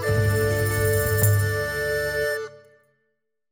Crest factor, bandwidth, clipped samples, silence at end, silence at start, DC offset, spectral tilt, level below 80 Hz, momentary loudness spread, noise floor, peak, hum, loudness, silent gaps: 16 dB; 17 kHz; under 0.1%; 0.95 s; 0 s; under 0.1%; -5 dB/octave; -40 dBFS; 6 LU; -76 dBFS; -8 dBFS; none; -23 LUFS; none